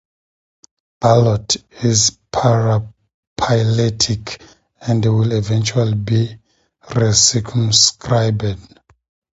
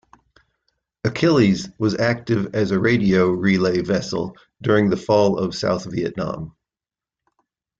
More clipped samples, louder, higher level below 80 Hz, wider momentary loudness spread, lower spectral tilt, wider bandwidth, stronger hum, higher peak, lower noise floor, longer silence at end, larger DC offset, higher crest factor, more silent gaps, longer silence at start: neither; first, -16 LUFS vs -20 LUFS; first, -44 dBFS vs -52 dBFS; first, 13 LU vs 10 LU; second, -4 dB/octave vs -6.5 dB/octave; about the same, 8 kHz vs 7.8 kHz; neither; first, 0 dBFS vs -4 dBFS; about the same, under -90 dBFS vs under -90 dBFS; second, 0.75 s vs 1.3 s; neither; about the same, 18 dB vs 16 dB; first, 3.14-3.36 s vs none; about the same, 1 s vs 1.05 s